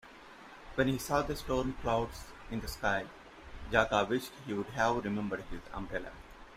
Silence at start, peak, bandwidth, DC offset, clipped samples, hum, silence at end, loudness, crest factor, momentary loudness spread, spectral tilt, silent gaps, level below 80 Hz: 0.05 s; -12 dBFS; 16 kHz; under 0.1%; under 0.1%; none; 0 s; -34 LUFS; 22 dB; 21 LU; -5 dB/octave; none; -50 dBFS